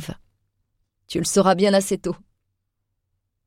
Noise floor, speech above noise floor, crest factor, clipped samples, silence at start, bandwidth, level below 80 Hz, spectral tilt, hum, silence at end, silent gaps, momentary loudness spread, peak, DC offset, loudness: -76 dBFS; 57 dB; 18 dB; under 0.1%; 0 s; 16.5 kHz; -54 dBFS; -4.5 dB/octave; none; 1.3 s; none; 17 LU; -6 dBFS; under 0.1%; -20 LUFS